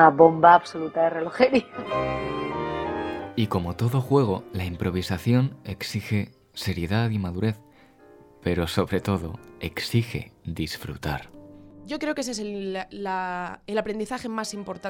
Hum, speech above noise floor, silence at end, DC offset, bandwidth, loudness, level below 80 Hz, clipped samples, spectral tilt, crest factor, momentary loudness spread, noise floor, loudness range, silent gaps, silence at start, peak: none; 28 dB; 0 s; under 0.1%; 18 kHz; -25 LUFS; -52 dBFS; under 0.1%; -6.5 dB/octave; 24 dB; 12 LU; -52 dBFS; 6 LU; none; 0 s; -2 dBFS